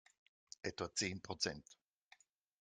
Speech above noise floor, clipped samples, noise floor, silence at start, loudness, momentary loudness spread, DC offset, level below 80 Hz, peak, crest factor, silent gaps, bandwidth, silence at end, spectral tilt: 27 dB; under 0.1%; -71 dBFS; 0.65 s; -42 LUFS; 13 LU; under 0.1%; -74 dBFS; -24 dBFS; 24 dB; none; 11.5 kHz; 0.85 s; -2.5 dB/octave